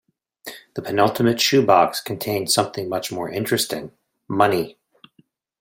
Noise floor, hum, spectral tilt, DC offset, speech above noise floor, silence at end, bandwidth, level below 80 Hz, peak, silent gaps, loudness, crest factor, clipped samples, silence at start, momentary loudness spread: -60 dBFS; none; -4 dB/octave; under 0.1%; 40 dB; 0.9 s; 16.5 kHz; -62 dBFS; -2 dBFS; none; -20 LUFS; 20 dB; under 0.1%; 0.45 s; 17 LU